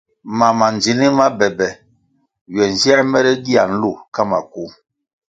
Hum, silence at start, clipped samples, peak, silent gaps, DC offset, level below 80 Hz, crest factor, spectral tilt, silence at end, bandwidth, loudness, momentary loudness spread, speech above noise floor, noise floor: none; 0.25 s; under 0.1%; 0 dBFS; 2.41-2.46 s, 4.08-4.12 s; under 0.1%; -54 dBFS; 16 dB; -4.5 dB/octave; 0.6 s; 9.2 kHz; -15 LUFS; 13 LU; 46 dB; -61 dBFS